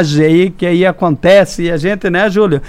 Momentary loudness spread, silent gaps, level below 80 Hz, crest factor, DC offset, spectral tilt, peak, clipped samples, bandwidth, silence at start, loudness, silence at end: 6 LU; none; -36 dBFS; 10 dB; under 0.1%; -6.5 dB/octave; 0 dBFS; under 0.1%; 15 kHz; 0 s; -11 LUFS; 0 s